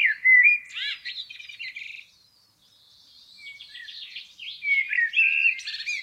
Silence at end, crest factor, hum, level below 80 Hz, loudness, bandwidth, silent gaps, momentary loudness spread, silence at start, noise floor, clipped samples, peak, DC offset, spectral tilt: 0 s; 18 dB; none; -78 dBFS; -20 LUFS; 12.5 kHz; none; 24 LU; 0 s; -61 dBFS; under 0.1%; -8 dBFS; under 0.1%; 3.5 dB/octave